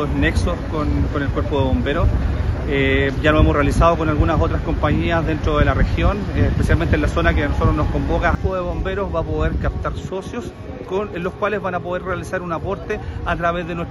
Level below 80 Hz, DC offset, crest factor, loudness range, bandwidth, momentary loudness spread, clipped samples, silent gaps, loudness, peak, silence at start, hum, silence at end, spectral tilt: -24 dBFS; under 0.1%; 18 dB; 7 LU; 12 kHz; 9 LU; under 0.1%; none; -20 LUFS; 0 dBFS; 0 s; none; 0 s; -7.5 dB/octave